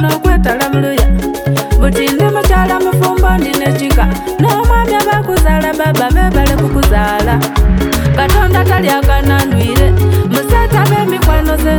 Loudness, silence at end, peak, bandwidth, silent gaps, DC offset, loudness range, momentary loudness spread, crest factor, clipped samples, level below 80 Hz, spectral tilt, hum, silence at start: -11 LUFS; 0 s; 0 dBFS; over 20 kHz; none; under 0.1%; 1 LU; 2 LU; 10 dB; under 0.1%; -14 dBFS; -6 dB/octave; none; 0 s